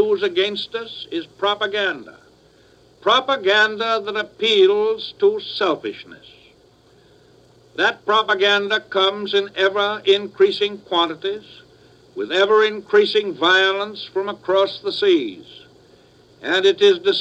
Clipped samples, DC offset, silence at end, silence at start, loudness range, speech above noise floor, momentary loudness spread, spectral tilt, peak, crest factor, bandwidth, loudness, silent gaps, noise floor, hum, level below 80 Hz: under 0.1%; under 0.1%; 0 s; 0 s; 4 LU; 34 dB; 13 LU; -3.5 dB/octave; -2 dBFS; 18 dB; 8.4 kHz; -18 LUFS; none; -53 dBFS; none; -66 dBFS